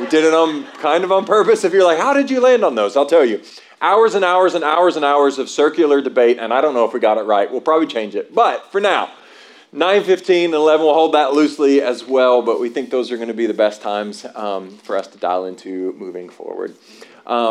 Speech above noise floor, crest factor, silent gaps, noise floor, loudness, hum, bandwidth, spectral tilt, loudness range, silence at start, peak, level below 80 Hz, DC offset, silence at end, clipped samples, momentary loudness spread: 28 dB; 12 dB; none; -43 dBFS; -16 LUFS; none; 11.5 kHz; -4 dB/octave; 8 LU; 0 s; -2 dBFS; -80 dBFS; under 0.1%; 0 s; under 0.1%; 12 LU